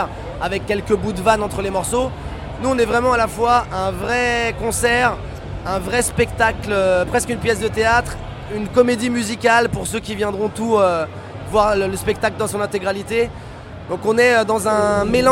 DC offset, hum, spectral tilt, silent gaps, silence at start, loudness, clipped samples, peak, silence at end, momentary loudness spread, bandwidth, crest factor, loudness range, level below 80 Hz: under 0.1%; none; -4.5 dB/octave; none; 0 s; -18 LUFS; under 0.1%; 0 dBFS; 0 s; 11 LU; 16.5 kHz; 18 dB; 2 LU; -36 dBFS